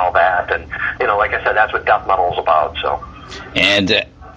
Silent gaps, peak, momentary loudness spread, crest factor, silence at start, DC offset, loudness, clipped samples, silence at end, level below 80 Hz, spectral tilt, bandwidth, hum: none; 0 dBFS; 9 LU; 16 dB; 0 s; under 0.1%; -16 LUFS; under 0.1%; 0 s; -40 dBFS; -4 dB/octave; 9.8 kHz; none